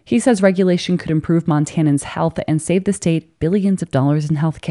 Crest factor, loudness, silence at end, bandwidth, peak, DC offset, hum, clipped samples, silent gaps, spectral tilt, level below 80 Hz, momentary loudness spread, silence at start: 16 dB; -17 LUFS; 0 s; 11.5 kHz; 0 dBFS; under 0.1%; none; under 0.1%; none; -6.5 dB/octave; -48 dBFS; 6 LU; 0.1 s